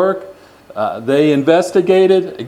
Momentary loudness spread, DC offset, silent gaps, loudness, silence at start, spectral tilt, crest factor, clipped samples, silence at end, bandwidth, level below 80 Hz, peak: 11 LU; under 0.1%; none; -13 LUFS; 0 s; -6 dB/octave; 14 dB; under 0.1%; 0 s; 12.5 kHz; -60 dBFS; 0 dBFS